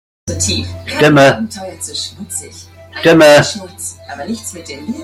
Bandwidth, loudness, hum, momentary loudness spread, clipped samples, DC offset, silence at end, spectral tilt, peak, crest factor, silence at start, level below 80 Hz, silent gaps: 16 kHz; -12 LUFS; none; 18 LU; under 0.1%; under 0.1%; 0 s; -4 dB/octave; 0 dBFS; 14 dB; 0.25 s; -48 dBFS; none